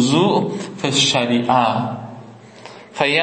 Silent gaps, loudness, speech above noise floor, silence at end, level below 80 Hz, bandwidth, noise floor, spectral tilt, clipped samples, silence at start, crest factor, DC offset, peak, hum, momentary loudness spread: none; -17 LUFS; 22 dB; 0 s; -64 dBFS; 8.8 kHz; -39 dBFS; -4 dB/octave; under 0.1%; 0 s; 16 dB; under 0.1%; -2 dBFS; none; 22 LU